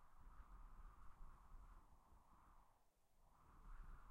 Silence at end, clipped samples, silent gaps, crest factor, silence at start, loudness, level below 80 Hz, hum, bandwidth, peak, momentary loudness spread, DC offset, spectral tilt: 0 s; under 0.1%; none; 14 dB; 0 s; -68 LUFS; -64 dBFS; none; 16 kHz; -48 dBFS; 3 LU; under 0.1%; -6 dB/octave